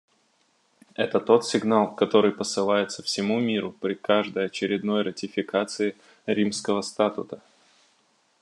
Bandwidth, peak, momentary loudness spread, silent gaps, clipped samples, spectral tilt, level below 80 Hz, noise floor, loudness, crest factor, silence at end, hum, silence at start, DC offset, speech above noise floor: 11.5 kHz; -4 dBFS; 9 LU; none; under 0.1%; -4.5 dB/octave; -78 dBFS; -67 dBFS; -25 LUFS; 20 dB; 1.05 s; none; 1 s; under 0.1%; 42 dB